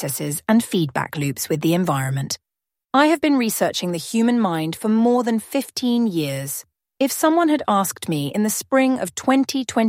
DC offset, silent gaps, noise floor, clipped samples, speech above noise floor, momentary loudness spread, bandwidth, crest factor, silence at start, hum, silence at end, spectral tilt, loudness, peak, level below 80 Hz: under 0.1%; none; -76 dBFS; under 0.1%; 56 dB; 7 LU; 16.5 kHz; 18 dB; 0 s; none; 0 s; -5 dB/octave; -20 LUFS; -2 dBFS; -62 dBFS